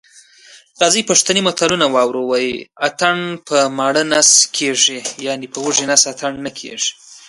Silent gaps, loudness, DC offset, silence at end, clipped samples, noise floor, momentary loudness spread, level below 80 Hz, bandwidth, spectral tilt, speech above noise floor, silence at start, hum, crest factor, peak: none; -14 LUFS; under 0.1%; 0.1 s; under 0.1%; -45 dBFS; 12 LU; -60 dBFS; 15 kHz; -1.5 dB/octave; 29 dB; 0.5 s; none; 16 dB; 0 dBFS